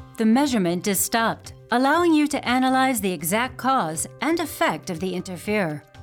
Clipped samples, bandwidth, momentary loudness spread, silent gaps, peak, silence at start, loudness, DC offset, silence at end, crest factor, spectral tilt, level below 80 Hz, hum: under 0.1%; 20 kHz; 9 LU; none; -8 dBFS; 0 s; -22 LUFS; under 0.1%; 0 s; 14 dB; -4 dB/octave; -56 dBFS; none